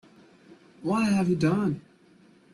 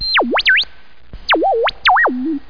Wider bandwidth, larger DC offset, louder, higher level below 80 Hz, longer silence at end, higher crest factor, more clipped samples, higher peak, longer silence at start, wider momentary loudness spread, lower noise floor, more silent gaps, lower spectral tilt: first, 12 kHz vs 5.4 kHz; second, under 0.1% vs 2%; second, -26 LUFS vs -14 LUFS; second, -62 dBFS vs -42 dBFS; first, 0.75 s vs 0.1 s; about the same, 16 dB vs 12 dB; neither; second, -14 dBFS vs -4 dBFS; first, 0.8 s vs 0 s; first, 11 LU vs 6 LU; first, -57 dBFS vs -44 dBFS; neither; first, -7 dB/octave vs -4 dB/octave